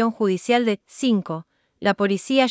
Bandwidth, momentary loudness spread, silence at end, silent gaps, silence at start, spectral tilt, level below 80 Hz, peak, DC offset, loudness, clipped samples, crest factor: 8 kHz; 6 LU; 0 s; none; 0 s; -5.5 dB/octave; -68 dBFS; -4 dBFS; under 0.1%; -22 LUFS; under 0.1%; 16 dB